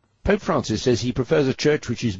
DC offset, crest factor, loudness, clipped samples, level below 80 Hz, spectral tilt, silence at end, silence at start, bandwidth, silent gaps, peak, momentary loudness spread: under 0.1%; 16 dB; -22 LUFS; under 0.1%; -42 dBFS; -5.5 dB/octave; 0 s; 0.25 s; 7.8 kHz; none; -6 dBFS; 3 LU